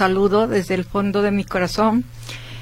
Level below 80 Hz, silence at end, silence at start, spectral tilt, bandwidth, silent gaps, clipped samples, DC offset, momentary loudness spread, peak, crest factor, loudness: -40 dBFS; 0 s; 0 s; -6 dB/octave; 16 kHz; none; under 0.1%; under 0.1%; 14 LU; -2 dBFS; 16 dB; -19 LUFS